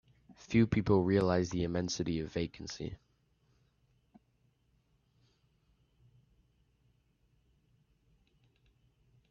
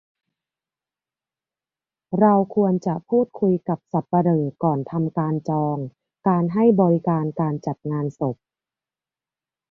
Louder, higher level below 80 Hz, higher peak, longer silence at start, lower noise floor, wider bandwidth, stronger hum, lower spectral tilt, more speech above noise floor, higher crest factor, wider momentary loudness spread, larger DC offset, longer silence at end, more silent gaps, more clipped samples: second, -32 LUFS vs -22 LUFS; about the same, -60 dBFS vs -64 dBFS; second, -14 dBFS vs -4 dBFS; second, 0.3 s vs 2.1 s; second, -74 dBFS vs under -90 dBFS; about the same, 7.2 kHz vs 6.6 kHz; neither; second, -6.5 dB/octave vs -11 dB/octave; second, 42 dB vs over 70 dB; first, 24 dB vs 18 dB; first, 14 LU vs 10 LU; neither; first, 6.35 s vs 1.35 s; neither; neither